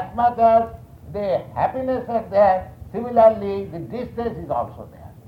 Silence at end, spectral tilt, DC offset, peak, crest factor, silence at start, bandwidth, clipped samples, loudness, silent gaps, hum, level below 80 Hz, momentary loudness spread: 0.05 s; -8.5 dB/octave; under 0.1%; -4 dBFS; 18 dB; 0 s; 5.2 kHz; under 0.1%; -20 LUFS; none; none; -46 dBFS; 16 LU